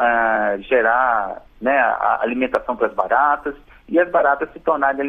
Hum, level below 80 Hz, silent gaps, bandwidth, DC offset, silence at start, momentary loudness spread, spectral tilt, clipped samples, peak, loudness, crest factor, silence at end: none; -50 dBFS; none; 5.4 kHz; under 0.1%; 0 s; 6 LU; -6.5 dB/octave; under 0.1%; -2 dBFS; -18 LUFS; 16 dB; 0 s